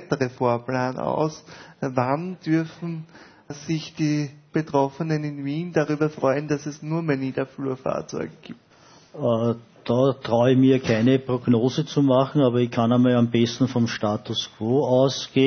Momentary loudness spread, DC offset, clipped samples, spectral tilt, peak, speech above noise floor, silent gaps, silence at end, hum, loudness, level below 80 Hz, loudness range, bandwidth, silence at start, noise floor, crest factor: 10 LU; under 0.1%; under 0.1%; -6.5 dB/octave; -6 dBFS; 30 dB; none; 0 s; none; -23 LUFS; -62 dBFS; 7 LU; 6.6 kHz; 0 s; -52 dBFS; 18 dB